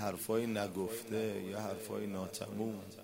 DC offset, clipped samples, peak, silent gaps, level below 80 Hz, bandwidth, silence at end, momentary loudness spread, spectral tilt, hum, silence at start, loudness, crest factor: under 0.1%; under 0.1%; -22 dBFS; none; -74 dBFS; 16 kHz; 0 s; 6 LU; -5 dB/octave; none; 0 s; -39 LUFS; 18 dB